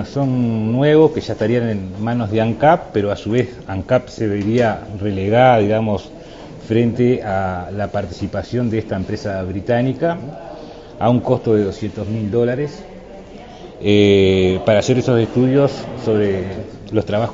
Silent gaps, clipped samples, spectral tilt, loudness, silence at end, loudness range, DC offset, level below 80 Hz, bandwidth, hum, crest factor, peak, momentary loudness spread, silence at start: none; under 0.1%; -7.5 dB/octave; -17 LUFS; 0 s; 5 LU; under 0.1%; -44 dBFS; 7.8 kHz; none; 16 dB; 0 dBFS; 17 LU; 0 s